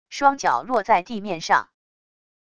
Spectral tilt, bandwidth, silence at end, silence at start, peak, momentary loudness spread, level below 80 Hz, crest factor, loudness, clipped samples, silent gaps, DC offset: -3.5 dB/octave; 10 kHz; 0.8 s; 0.1 s; -4 dBFS; 6 LU; -60 dBFS; 20 dB; -21 LUFS; under 0.1%; none; 0.5%